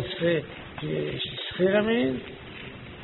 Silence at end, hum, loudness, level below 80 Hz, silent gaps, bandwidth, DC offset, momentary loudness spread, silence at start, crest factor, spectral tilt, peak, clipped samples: 0 s; none; -27 LUFS; -54 dBFS; none; 4.2 kHz; under 0.1%; 17 LU; 0 s; 16 dB; -4 dB/octave; -12 dBFS; under 0.1%